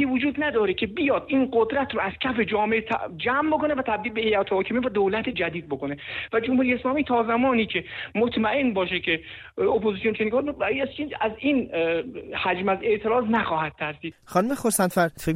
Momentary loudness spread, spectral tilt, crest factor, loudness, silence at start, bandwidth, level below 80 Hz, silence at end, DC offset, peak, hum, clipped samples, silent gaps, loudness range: 7 LU; -4.5 dB/octave; 16 dB; -24 LUFS; 0 s; 14.5 kHz; -52 dBFS; 0 s; under 0.1%; -8 dBFS; none; under 0.1%; none; 1 LU